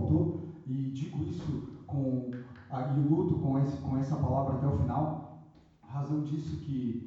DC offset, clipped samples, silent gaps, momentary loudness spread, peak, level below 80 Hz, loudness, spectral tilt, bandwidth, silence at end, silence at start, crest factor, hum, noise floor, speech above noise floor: under 0.1%; under 0.1%; none; 12 LU; -16 dBFS; -52 dBFS; -33 LUFS; -10 dB/octave; 7.2 kHz; 0 s; 0 s; 16 dB; none; -57 dBFS; 26 dB